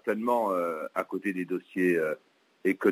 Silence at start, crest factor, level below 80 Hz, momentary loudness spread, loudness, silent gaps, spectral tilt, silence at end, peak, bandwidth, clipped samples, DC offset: 0.05 s; 18 dB; -82 dBFS; 7 LU; -29 LUFS; none; -7 dB/octave; 0 s; -12 dBFS; 16 kHz; under 0.1%; under 0.1%